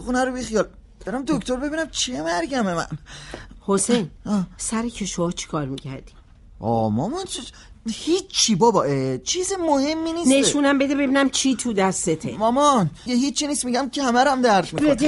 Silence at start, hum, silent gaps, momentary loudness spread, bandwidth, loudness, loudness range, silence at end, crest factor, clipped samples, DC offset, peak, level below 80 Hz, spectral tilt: 0 s; none; none; 13 LU; 11.5 kHz; -21 LUFS; 7 LU; 0 s; 16 dB; under 0.1%; under 0.1%; -6 dBFS; -46 dBFS; -4 dB/octave